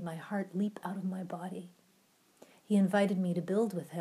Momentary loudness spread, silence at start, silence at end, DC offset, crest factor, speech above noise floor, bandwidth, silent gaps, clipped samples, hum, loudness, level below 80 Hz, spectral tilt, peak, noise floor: 12 LU; 0 s; 0 s; under 0.1%; 16 dB; 35 dB; 14 kHz; none; under 0.1%; none; -33 LUFS; -88 dBFS; -7.5 dB/octave; -18 dBFS; -68 dBFS